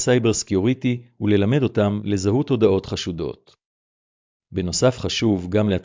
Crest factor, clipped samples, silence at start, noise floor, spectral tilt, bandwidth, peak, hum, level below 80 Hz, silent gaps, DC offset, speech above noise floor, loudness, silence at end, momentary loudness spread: 16 dB; under 0.1%; 0 s; under -90 dBFS; -5.5 dB/octave; 7.6 kHz; -6 dBFS; none; -42 dBFS; 3.66-4.40 s; under 0.1%; over 70 dB; -21 LUFS; 0 s; 9 LU